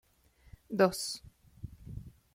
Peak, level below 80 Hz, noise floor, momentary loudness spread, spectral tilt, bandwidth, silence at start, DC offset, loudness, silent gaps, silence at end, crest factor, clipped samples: -12 dBFS; -58 dBFS; -65 dBFS; 21 LU; -4.5 dB/octave; 16.5 kHz; 0.7 s; under 0.1%; -32 LUFS; none; 0.25 s; 24 dB; under 0.1%